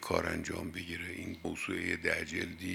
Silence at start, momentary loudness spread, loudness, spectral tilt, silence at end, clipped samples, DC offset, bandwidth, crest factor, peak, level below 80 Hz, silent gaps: 0 s; 7 LU; -36 LUFS; -4.5 dB/octave; 0 s; under 0.1%; under 0.1%; 17.5 kHz; 24 dB; -14 dBFS; -62 dBFS; none